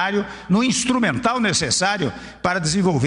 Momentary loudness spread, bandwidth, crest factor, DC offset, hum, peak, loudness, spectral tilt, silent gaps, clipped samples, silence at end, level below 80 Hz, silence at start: 7 LU; 11 kHz; 14 dB; under 0.1%; none; -4 dBFS; -20 LUFS; -4 dB/octave; none; under 0.1%; 0 s; -48 dBFS; 0 s